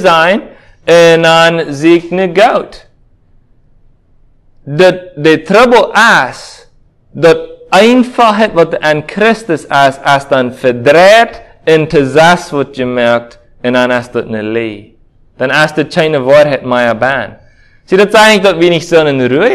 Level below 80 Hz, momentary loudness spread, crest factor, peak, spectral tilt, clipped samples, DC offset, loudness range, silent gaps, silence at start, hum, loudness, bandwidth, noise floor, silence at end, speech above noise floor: -44 dBFS; 11 LU; 10 dB; 0 dBFS; -5 dB/octave; 3%; under 0.1%; 5 LU; none; 0 s; none; -8 LUFS; 16 kHz; -45 dBFS; 0 s; 37 dB